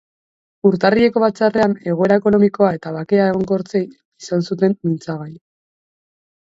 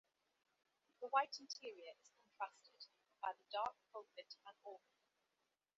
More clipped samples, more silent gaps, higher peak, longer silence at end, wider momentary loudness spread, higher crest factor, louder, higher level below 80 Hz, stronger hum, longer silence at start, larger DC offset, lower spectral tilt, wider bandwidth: neither; first, 4.05-4.12 s vs none; first, 0 dBFS vs -24 dBFS; first, 1.2 s vs 1 s; second, 12 LU vs 21 LU; second, 18 dB vs 26 dB; first, -17 LUFS vs -47 LUFS; first, -54 dBFS vs under -90 dBFS; neither; second, 0.65 s vs 1 s; neither; first, -7.5 dB/octave vs 2.5 dB/octave; about the same, 7.8 kHz vs 7.4 kHz